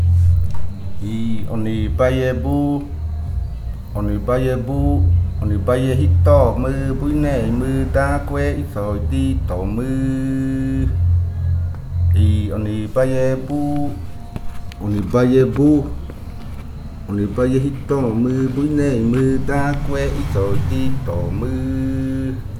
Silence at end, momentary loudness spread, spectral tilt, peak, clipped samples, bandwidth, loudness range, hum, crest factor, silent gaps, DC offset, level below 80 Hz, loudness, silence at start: 0 s; 12 LU; -8.5 dB/octave; -2 dBFS; under 0.1%; 13 kHz; 3 LU; none; 16 dB; none; under 0.1%; -26 dBFS; -19 LUFS; 0 s